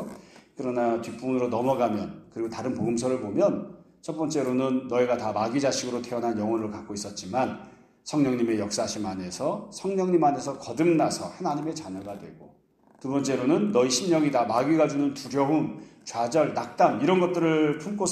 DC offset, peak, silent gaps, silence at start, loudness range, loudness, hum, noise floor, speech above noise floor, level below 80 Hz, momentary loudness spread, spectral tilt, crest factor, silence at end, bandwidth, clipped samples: under 0.1%; -8 dBFS; none; 0 s; 4 LU; -26 LUFS; none; -47 dBFS; 21 dB; -66 dBFS; 12 LU; -5 dB/octave; 18 dB; 0 s; 13.5 kHz; under 0.1%